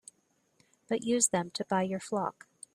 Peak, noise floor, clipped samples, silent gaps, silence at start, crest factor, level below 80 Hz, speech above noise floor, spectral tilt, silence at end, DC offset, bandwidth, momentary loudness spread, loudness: -12 dBFS; -73 dBFS; under 0.1%; none; 0.9 s; 22 dB; -74 dBFS; 42 dB; -3.5 dB/octave; 0.45 s; under 0.1%; 14.5 kHz; 10 LU; -31 LUFS